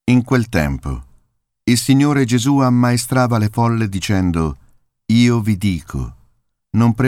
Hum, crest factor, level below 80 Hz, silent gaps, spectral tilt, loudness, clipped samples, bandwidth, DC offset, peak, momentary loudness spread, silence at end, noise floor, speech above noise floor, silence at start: none; 16 dB; -36 dBFS; none; -6 dB/octave; -16 LUFS; under 0.1%; 16 kHz; under 0.1%; 0 dBFS; 12 LU; 0 s; -61 dBFS; 46 dB; 0.05 s